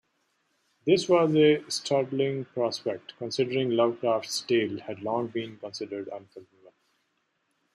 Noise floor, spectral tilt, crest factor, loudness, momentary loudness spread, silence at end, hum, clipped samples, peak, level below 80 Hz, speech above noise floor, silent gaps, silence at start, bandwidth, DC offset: -75 dBFS; -5 dB/octave; 20 dB; -27 LUFS; 14 LU; 1.3 s; none; under 0.1%; -8 dBFS; -74 dBFS; 48 dB; none; 0.85 s; 14 kHz; under 0.1%